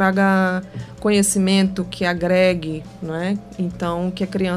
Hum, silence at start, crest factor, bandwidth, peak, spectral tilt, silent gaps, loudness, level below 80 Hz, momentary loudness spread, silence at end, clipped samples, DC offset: 60 Hz at -40 dBFS; 0 s; 16 dB; 15.5 kHz; -4 dBFS; -5 dB/octave; none; -20 LUFS; -46 dBFS; 11 LU; 0 s; under 0.1%; under 0.1%